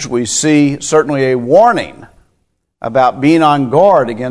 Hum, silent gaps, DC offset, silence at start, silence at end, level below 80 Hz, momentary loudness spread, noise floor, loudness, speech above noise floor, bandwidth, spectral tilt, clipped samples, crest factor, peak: none; none; under 0.1%; 0 s; 0 s; -50 dBFS; 8 LU; -63 dBFS; -11 LUFS; 53 dB; 11 kHz; -5 dB/octave; 0.3%; 12 dB; 0 dBFS